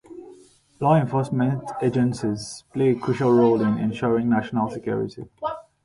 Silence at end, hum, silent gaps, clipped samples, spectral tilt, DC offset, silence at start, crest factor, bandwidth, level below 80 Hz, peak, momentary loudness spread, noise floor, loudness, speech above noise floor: 0.25 s; none; none; under 0.1%; -7.5 dB/octave; under 0.1%; 0.1 s; 16 dB; 11.5 kHz; -56 dBFS; -6 dBFS; 13 LU; -51 dBFS; -23 LUFS; 29 dB